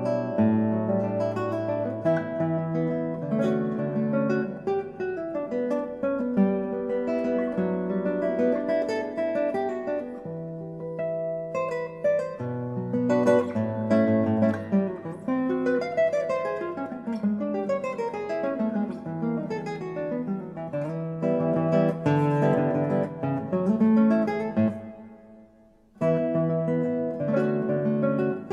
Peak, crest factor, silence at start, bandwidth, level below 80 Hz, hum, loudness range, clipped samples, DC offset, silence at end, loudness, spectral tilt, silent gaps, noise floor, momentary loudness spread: -8 dBFS; 16 dB; 0 s; 8.6 kHz; -64 dBFS; none; 5 LU; under 0.1%; under 0.1%; 0 s; -26 LUFS; -9 dB/octave; none; -56 dBFS; 9 LU